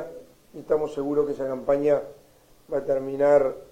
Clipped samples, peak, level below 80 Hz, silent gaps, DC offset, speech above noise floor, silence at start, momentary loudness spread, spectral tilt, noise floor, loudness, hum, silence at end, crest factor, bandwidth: under 0.1%; -8 dBFS; -56 dBFS; none; under 0.1%; 21 dB; 0 s; 13 LU; -7.5 dB/octave; -44 dBFS; -24 LUFS; none; 0.05 s; 18 dB; 13.5 kHz